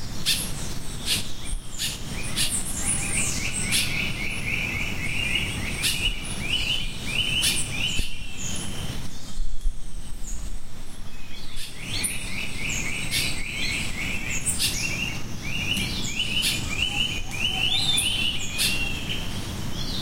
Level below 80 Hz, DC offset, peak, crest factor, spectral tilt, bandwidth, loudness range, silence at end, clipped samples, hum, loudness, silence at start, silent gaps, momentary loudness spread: -34 dBFS; under 0.1%; -8 dBFS; 18 dB; -1.5 dB/octave; 16 kHz; 9 LU; 0 s; under 0.1%; none; -25 LUFS; 0 s; none; 14 LU